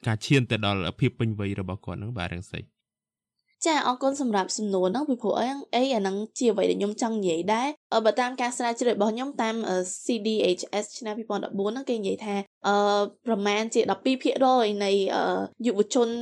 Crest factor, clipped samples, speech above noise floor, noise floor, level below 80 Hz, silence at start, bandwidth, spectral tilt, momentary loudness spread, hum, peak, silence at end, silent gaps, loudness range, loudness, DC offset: 18 dB; under 0.1%; over 64 dB; under -90 dBFS; -62 dBFS; 0.05 s; 12 kHz; -5 dB/octave; 8 LU; none; -8 dBFS; 0 s; 7.77-7.90 s, 12.47-12.61 s; 5 LU; -26 LUFS; under 0.1%